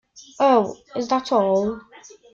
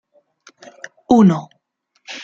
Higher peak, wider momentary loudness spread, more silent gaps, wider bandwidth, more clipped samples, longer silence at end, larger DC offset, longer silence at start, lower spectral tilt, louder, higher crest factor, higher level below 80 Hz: second, -6 dBFS vs 0 dBFS; second, 11 LU vs 25 LU; neither; about the same, 7.6 kHz vs 7.6 kHz; neither; first, 0.55 s vs 0 s; neither; second, 0.15 s vs 1.1 s; second, -5.5 dB/octave vs -7.5 dB/octave; second, -21 LUFS vs -14 LUFS; about the same, 16 dB vs 18 dB; second, -60 dBFS vs -54 dBFS